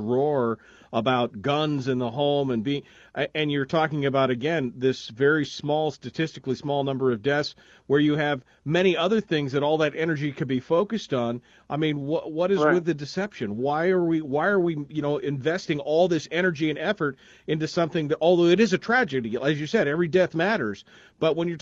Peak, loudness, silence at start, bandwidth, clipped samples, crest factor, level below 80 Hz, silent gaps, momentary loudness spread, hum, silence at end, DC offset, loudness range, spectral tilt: -8 dBFS; -25 LUFS; 0 s; 7.6 kHz; under 0.1%; 18 dB; -64 dBFS; none; 8 LU; none; 0.05 s; under 0.1%; 3 LU; -6.5 dB/octave